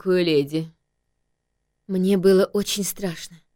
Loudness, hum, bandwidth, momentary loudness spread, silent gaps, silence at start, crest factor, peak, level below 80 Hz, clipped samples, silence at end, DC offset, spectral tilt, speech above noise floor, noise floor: -21 LUFS; 50 Hz at -45 dBFS; 17 kHz; 13 LU; none; 0.05 s; 16 dB; -6 dBFS; -56 dBFS; under 0.1%; 0.2 s; under 0.1%; -5 dB/octave; 54 dB; -75 dBFS